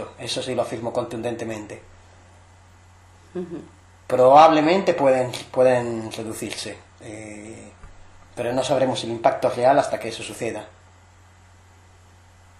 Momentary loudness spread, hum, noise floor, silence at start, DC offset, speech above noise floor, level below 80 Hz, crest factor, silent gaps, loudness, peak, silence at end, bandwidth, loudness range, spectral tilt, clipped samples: 22 LU; none; -51 dBFS; 0 s; under 0.1%; 30 dB; -58 dBFS; 20 dB; none; -21 LUFS; -2 dBFS; 1.95 s; 13 kHz; 12 LU; -5 dB/octave; under 0.1%